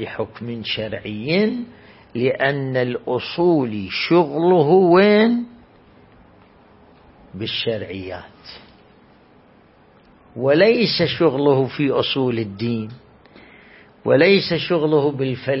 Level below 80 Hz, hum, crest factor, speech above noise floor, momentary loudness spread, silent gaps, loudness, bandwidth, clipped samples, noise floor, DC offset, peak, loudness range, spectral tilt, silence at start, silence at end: -56 dBFS; none; 18 dB; 33 dB; 17 LU; none; -18 LUFS; 5.8 kHz; under 0.1%; -51 dBFS; under 0.1%; -2 dBFS; 13 LU; -10.5 dB/octave; 0 s; 0 s